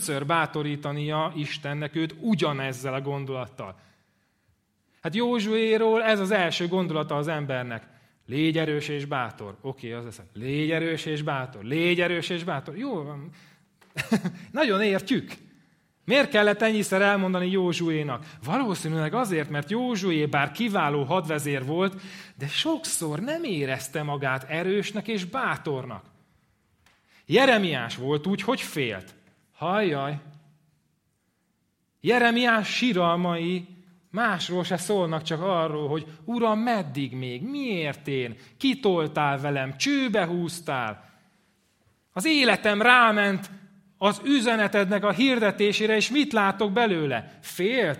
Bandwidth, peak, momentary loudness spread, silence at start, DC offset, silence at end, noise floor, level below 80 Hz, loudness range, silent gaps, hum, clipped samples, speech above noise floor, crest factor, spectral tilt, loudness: 16 kHz; 0 dBFS; 13 LU; 0 s; under 0.1%; 0 s; -72 dBFS; -70 dBFS; 7 LU; none; none; under 0.1%; 47 dB; 26 dB; -5 dB/octave; -25 LUFS